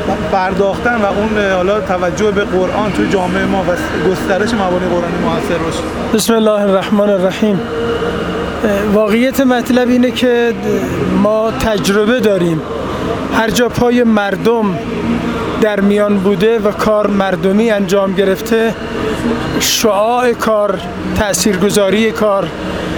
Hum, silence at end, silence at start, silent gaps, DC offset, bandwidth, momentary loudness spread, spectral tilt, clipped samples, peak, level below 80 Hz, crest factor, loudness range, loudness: none; 0 s; 0 s; none; under 0.1%; over 20 kHz; 5 LU; -5 dB/octave; under 0.1%; 0 dBFS; -34 dBFS; 12 dB; 2 LU; -13 LUFS